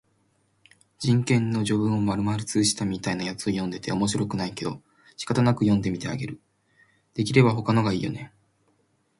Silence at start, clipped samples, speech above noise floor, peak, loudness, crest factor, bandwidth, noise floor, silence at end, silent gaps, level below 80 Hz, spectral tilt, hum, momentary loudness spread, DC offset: 1 s; under 0.1%; 44 dB; -6 dBFS; -25 LUFS; 20 dB; 11.5 kHz; -68 dBFS; 0.9 s; none; -54 dBFS; -5.5 dB/octave; none; 13 LU; under 0.1%